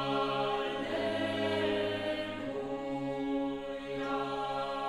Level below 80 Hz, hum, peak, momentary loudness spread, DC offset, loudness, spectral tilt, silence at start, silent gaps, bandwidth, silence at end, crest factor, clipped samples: -60 dBFS; none; -20 dBFS; 6 LU; under 0.1%; -34 LUFS; -5.5 dB/octave; 0 s; none; 12 kHz; 0 s; 14 dB; under 0.1%